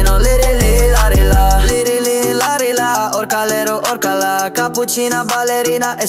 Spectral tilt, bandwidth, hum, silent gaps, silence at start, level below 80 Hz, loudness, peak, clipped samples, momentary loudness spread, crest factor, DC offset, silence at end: -4 dB/octave; 16 kHz; none; none; 0 s; -16 dBFS; -14 LUFS; -2 dBFS; under 0.1%; 4 LU; 12 dB; under 0.1%; 0 s